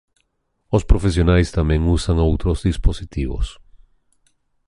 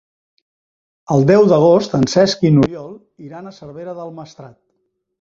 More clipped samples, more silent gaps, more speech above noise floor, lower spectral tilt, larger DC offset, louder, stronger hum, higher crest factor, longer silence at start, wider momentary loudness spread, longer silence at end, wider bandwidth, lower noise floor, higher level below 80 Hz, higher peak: neither; neither; about the same, 52 dB vs 54 dB; about the same, -7 dB/octave vs -6.5 dB/octave; neither; second, -20 LUFS vs -13 LUFS; neither; about the same, 16 dB vs 16 dB; second, 0.7 s vs 1.1 s; second, 10 LU vs 24 LU; first, 1.15 s vs 0.75 s; first, 11.5 kHz vs 7.8 kHz; about the same, -69 dBFS vs -69 dBFS; first, -24 dBFS vs -50 dBFS; about the same, -2 dBFS vs 0 dBFS